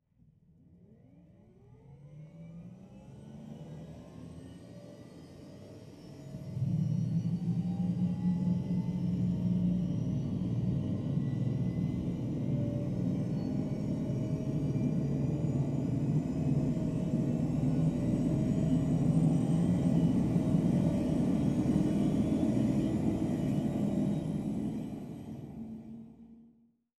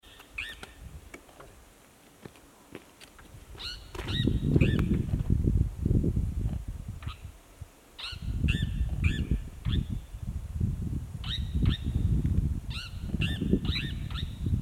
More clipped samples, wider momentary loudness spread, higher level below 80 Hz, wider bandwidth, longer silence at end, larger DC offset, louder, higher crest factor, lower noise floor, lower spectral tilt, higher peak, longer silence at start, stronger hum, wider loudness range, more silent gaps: neither; about the same, 21 LU vs 22 LU; second, -52 dBFS vs -36 dBFS; second, 11.5 kHz vs 15.5 kHz; first, 0.55 s vs 0 s; neither; about the same, -32 LUFS vs -31 LUFS; second, 16 dB vs 22 dB; first, -65 dBFS vs -57 dBFS; first, -9 dB/octave vs -7 dB/octave; second, -16 dBFS vs -8 dBFS; first, 1.9 s vs 0.05 s; neither; first, 20 LU vs 14 LU; neither